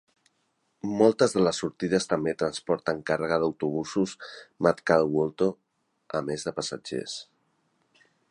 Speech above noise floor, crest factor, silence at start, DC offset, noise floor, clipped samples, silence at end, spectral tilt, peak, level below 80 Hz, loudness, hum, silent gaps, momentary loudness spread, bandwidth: 47 dB; 22 dB; 0.85 s; under 0.1%; -73 dBFS; under 0.1%; 1.05 s; -5 dB/octave; -6 dBFS; -62 dBFS; -27 LUFS; none; none; 11 LU; 11.5 kHz